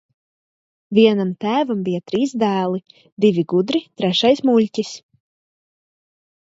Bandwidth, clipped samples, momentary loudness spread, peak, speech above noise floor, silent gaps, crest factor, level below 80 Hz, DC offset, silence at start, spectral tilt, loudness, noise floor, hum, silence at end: 7.8 kHz; under 0.1%; 9 LU; -2 dBFS; over 72 dB; 3.12-3.17 s; 18 dB; -66 dBFS; under 0.1%; 0.9 s; -6 dB/octave; -18 LUFS; under -90 dBFS; none; 1.5 s